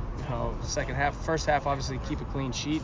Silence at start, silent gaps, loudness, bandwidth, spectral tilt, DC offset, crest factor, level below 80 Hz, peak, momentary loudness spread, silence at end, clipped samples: 0 s; none; -30 LUFS; 7.6 kHz; -5 dB/octave; under 0.1%; 16 dB; -38 dBFS; -14 dBFS; 7 LU; 0 s; under 0.1%